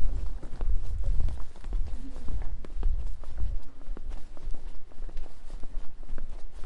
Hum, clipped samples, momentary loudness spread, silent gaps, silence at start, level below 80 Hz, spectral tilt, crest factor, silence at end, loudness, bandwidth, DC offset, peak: none; under 0.1%; 11 LU; none; 0 s; -30 dBFS; -7 dB/octave; 14 dB; 0 s; -39 LUFS; 2.2 kHz; under 0.1%; -10 dBFS